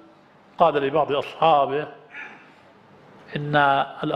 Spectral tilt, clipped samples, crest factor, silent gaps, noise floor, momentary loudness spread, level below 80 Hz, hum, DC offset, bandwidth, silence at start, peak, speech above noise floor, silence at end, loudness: -7 dB/octave; under 0.1%; 20 dB; none; -52 dBFS; 19 LU; -62 dBFS; none; under 0.1%; 9.2 kHz; 0.6 s; -4 dBFS; 32 dB; 0 s; -21 LUFS